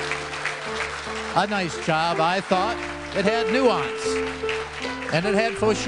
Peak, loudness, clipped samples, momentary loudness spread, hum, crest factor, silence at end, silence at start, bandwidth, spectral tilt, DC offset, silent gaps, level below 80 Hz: -4 dBFS; -24 LUFS; under 0.1%; 7 LU; none; 20 dB; 0 s; 0 s; 11 kHz; -4 dB/octave; under 0.1%; none; -48 dBFS